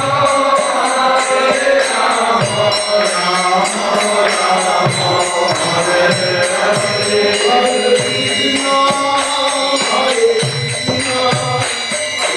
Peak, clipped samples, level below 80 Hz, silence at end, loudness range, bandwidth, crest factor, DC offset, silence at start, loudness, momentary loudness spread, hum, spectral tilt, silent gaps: -2 dBFS; under 0.1%; -52 dBFS; 0 s; 1 LU; 12.5 kHz; 12 dB; under 0.1%; 0 s; -13 LUFS; 3 LU; none; -2.5 dB/octave; none